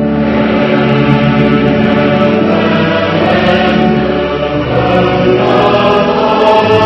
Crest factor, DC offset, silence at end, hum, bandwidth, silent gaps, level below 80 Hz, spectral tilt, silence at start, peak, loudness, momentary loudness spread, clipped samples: 10 dB; under 0.1%; 0 s; none; 6.8 kHz; none; -32 dBFS; -7.5 dB/octave; 0 s; 0 dBFS; -10 LUFS; 3 LU; 0.6%